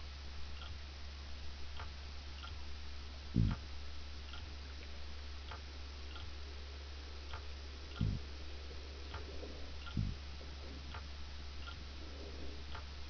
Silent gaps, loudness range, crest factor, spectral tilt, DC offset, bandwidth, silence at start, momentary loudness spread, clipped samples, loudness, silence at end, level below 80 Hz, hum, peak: none; 5 LU; 26 dB; -5 dB/octave; 0.2%; 5.4 kHz; 0 s; 9 LU; under 0.1%; -46 LUFS; 0 s; -48 dBFS; none; -18 dBFS